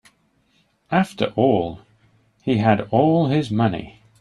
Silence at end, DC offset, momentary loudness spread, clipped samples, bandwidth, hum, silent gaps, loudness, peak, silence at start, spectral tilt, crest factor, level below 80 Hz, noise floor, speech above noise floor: 0.3 s; under 0.1%; 8 LU; under 0.1%; 12 kHz; none; none; -20 LUFS; -4 dBFS; 0.9 s; -8 dB/octave; 18 dB; -54 dBFS; -63 dBFS; 44 dB